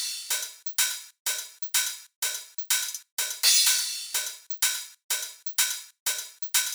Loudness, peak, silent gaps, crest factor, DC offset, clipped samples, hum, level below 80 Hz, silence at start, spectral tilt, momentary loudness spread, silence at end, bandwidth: -26 LUFS; -6 dBFS; 1.20-1.25 s, 2.16-2.22 s, 3.12-3.17 s, 5.04-5.09 s, 6.00-6.06 s; 22 dB; under 0.1%; under 0.1%; none; under -90 dBFS; 0 s; 7.5 dB/octave; 11 LU; 0 s; over 20 kHz